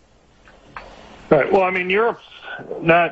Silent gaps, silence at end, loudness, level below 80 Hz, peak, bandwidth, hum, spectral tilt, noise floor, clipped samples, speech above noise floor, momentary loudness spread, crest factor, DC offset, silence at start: none; 0 s; -18 LUFS; -52 dBFS; -2 dBFS; 7.8 kHz; none; -7 dB/octave; -51 dBFS; under 0.1%; 34 dB; 23 LU; 20 dB; under 0.1%; 0.75 s